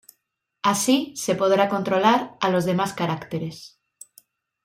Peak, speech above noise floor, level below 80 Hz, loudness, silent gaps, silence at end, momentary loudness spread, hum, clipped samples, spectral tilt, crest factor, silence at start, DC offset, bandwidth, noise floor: -4 dBFS; 54 dB; -66 dBFS; -22 LUFS; none; 0.95 s; 11 LU; none; under 0.1%; -4.5 dB/octave; 18 dB; 0.65 s; under 0.1%; 16 kHz; -76 dBFS